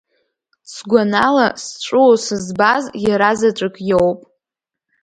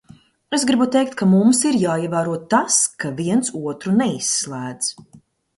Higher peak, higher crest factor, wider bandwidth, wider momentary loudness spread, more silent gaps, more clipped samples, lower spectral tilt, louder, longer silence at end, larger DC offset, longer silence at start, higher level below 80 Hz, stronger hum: about the same, 0 dBFS vs -2 dBFS; about the same, 16 dB vs 16 dB; about the same, 11 kHz vs 11.5 kHz; about the same, 11 LU vs 10 LU; neither; neither; about the same, -4.5 dB/octave vs -4 dB/octave; first, -15 LUFS vs -19 LUFS; first, 0.85 s vs 0.4 s; neither; first, 0.7 s vs 0.5 s; first, -52 dBFS vs -62 dBFS; neither